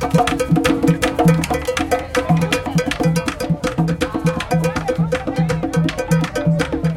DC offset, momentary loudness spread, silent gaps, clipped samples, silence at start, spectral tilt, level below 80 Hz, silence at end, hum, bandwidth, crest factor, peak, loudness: under 0.1%; 5 LU; none; under 0.1%; 0 s; -6 dB/octave; -36 dBFS; 0 s; none; 16 kHz; 16 dB; -2 dBFS; -18 LUFS